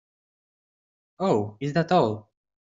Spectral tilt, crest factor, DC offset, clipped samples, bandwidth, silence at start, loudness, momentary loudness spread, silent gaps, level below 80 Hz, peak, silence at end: -7.5 dB/octave; 20 dB; under 0.1%; under 0.1%; 7.8 kHz; 1.2 s; -25 LUFS; 7 LU; none; -64 dBFS; -8 dBFS; 0.4 s